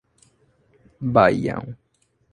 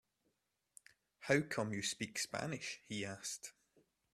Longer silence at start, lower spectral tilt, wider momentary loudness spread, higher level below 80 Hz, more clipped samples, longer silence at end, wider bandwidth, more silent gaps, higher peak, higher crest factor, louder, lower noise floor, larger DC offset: second, 1 s vs 1.2 s; first, -7.5 dB/octave vs -3.5 dB/octave; first, 16 LU vs 11 LU; first, -52 dBFS vs -78 dBFS; neither; about the same, 0.6 s vs 0.65 s; second, 10.5 kHz vs 15.5 kHz; neither; first, -2 dBFS vs -18 dBFS; about the same, 22 dB vs 26 dB; first, -20 LUFS vs -40 LUFS; second, -61 dBFS vs -84 dBFS; neither